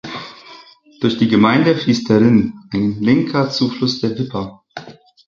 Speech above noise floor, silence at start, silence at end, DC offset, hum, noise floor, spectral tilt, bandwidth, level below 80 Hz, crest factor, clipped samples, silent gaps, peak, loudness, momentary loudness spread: 28 dB; 0.05 s; 0.35 s; under 0.1%; none; -43 dBFS; -6.5 dB/octave; 7.4 kHz; -50 dBFS; 16 dB; under 0.1%; none; 0 dBFS; -16 LUFS; 18 LU